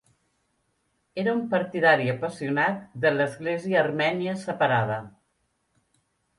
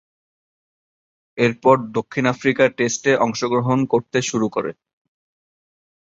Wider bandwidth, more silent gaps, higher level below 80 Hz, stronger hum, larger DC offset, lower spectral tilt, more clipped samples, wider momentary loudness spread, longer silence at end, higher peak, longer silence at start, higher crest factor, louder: first, 11.5 kHz vs 8 kHz; neither; second, -68 dBFS vs -60 dBFS; neither; neither; first, -6.5 dB/octave vs -5 dB/octave; neither; about the same, 9 LU vs 7 LU; about the same, 1.3 s vs 1.3 s; second, -6 dBFS vs -2 dBFS; second, 1.15 s vs 1.35 s; about the same, 20 dB vs 20 dB; second, -25 LUFS vs -19 LUFS